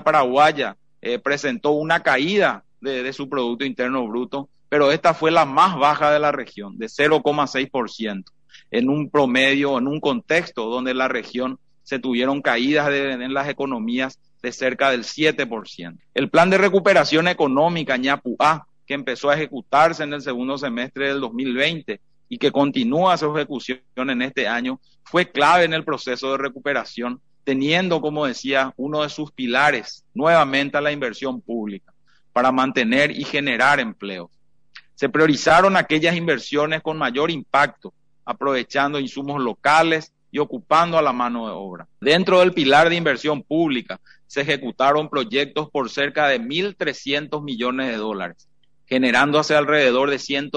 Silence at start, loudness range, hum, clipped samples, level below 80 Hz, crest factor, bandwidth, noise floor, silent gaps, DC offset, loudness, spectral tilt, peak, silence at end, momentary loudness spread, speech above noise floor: 0 s; 4 LU; none; under 0.1%; -60 dBFS; 16 dB; 10 kHz; -49 dBFS; none; 0.2%; -20 LUFS; -5 dB/octave; -4 dBFS; 0 s; 13 LU; 29 dB